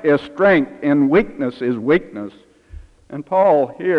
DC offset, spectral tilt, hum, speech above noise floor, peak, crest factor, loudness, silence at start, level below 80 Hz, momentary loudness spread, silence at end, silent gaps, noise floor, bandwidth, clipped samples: under 0.1%; -8.5 dB/octave; none; 23 dB; -4 dBFS; 14 dB; -17 LUFS; 0 s; -46 dBFS; 17 LU; 0 s; none; -40 dBFS; 5.8 kHz; under 0.1%